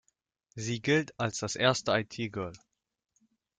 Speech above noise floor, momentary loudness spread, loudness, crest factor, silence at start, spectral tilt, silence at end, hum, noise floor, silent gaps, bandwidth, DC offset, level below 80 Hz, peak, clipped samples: 43 dB; 12 LU; -30 LUFS; 22 dB; 0.55 s; -4 dB/octave; 1 s; none; -74 dBFS; none; 9.6 kHz; under 0.1%; -68 dBFS; -10 dBFS; under 0.1%